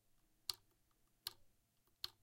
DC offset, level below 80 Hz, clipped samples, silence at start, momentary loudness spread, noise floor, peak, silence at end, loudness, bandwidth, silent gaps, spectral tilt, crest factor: under 0.1%; -80 dBFS; under 0.1%; 0.5 s; 4 LU; -79 dBFS; -22 dBFS; 0.1 s; -50 LUFS; 16 kHz; none; 0.5 dB/octave; 34 dB